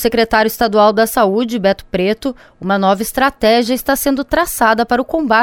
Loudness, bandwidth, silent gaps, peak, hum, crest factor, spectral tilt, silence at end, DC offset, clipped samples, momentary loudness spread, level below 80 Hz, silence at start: -14 LUFS; 19 kHz; none; 0 dBFS; none; 14 dB; -4 dB/octave; 0 s; under 0.1%; under 0.1%; 6 LU; -38 dBFS; 0 s